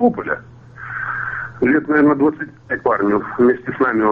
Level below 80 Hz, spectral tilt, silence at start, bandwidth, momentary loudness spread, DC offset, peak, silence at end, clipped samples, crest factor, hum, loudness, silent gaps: -52 dBFS; -9.5 dB/octave; 0 s; 4.4 kHz; 12 LU; under 0.1%; -4 dBFS; 0 s; under 0.1%; 14 dB; none; -18 LUFS; none